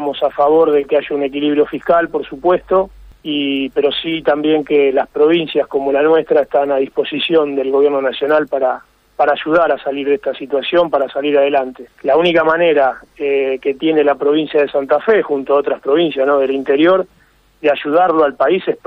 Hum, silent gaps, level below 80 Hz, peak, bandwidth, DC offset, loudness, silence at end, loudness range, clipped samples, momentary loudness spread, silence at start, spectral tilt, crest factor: none; none; -52 dBFS; -2 dBFS; 5.2 kHz; under 0.1%; -15 LUFS; 0.1 s; 2 LU; under 0.1%; 6 LU; 0 s; -7 dB/octave; 12 dB